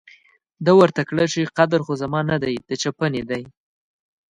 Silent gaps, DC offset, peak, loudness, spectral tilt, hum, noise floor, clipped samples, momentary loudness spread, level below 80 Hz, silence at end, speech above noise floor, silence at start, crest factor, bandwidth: none; under 0.1%; -2 dBFS; -20 LUFS; -5.5 dB/octave; none; -54 dBFS; under 0.1%; 11 LU; -56 dBFS; 0.85 s; 35 dB; 0.6 s; 18 dB; 10 kHz